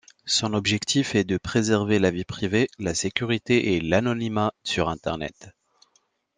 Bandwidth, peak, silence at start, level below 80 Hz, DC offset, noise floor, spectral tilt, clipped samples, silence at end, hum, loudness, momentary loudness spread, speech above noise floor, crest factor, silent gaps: 10 kHz; -4 dBFS; 0.25 s; -54 dBFS; under 0.1%; -68 dBFS; -4.5 dB/octave; under 0.1%; 0.9 s; none; -24 LUFS; 5 LU; 44 dB; 22 dB; none